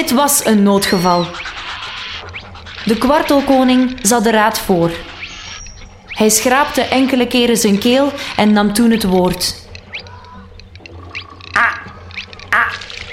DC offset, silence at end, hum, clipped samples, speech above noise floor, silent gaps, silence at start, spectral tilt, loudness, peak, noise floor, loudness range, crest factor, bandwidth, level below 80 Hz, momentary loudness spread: under 0.1%; 0 s; none; under 0.1%; 23 dB; none; 0 s; -3.5 dB/octave; -13 LUFS; 0 dBFS; -36 dBFS; 6 LU; 14 dB; 16.5 kHz; -40 dBFS; 17 LU